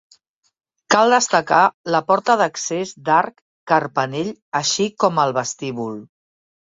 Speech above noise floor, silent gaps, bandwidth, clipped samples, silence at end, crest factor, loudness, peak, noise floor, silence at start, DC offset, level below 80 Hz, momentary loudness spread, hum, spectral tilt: 39 dB; 1.74-1.84 s, 3.41-3.67 s, 4.42-4.52 s; 8.2 kHz; under 0.1%; 0.6 s; 18 dB; -18 LUFS; -2 dBFS; -58 dBFS; 0.9 s; under 0.1%; -66 dBFS; 12 LU; none; -3 dB/octave